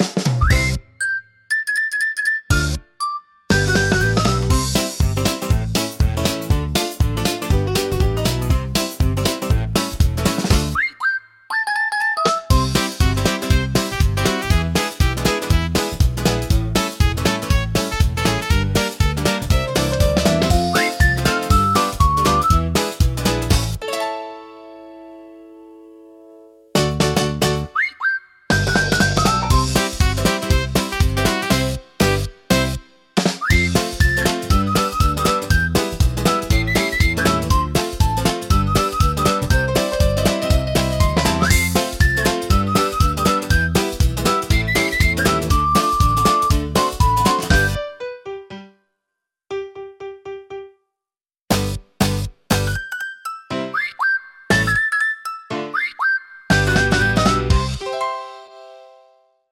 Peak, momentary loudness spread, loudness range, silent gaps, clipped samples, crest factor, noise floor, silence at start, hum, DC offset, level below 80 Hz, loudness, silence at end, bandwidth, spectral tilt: -2 dBFS; 9 LU; 6 LU; none; under 0.1%; 16 dB; under -90 dBFS; 0 s; none; under 0.1%; -26 dBFS; -18 LUFS; 0.7 s; 17 kHz; -4.5 dB/octave